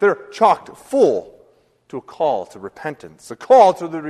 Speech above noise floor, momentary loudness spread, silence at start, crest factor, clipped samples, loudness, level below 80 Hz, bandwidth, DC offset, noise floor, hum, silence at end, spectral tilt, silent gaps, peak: 37 dB; 22 LU; 0 s; 18 dB; under 0.1%; -16 LUFS; -62 dBFS; 12.5 kHz; under 0.1%; -55 dBFS; none; 0 s; -5.5 dB/octave; none; 0 dBFS